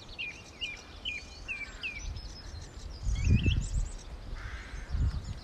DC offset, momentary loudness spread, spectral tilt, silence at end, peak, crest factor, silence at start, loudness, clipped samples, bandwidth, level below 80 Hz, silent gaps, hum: under 0.1%; 16 LU; -5 dB/octave; 0 s; -14 dBFS; 20 dB; 0 s; -36 LUFS; under 0.1%; 9.8 kHz; -38 dBFS; none; none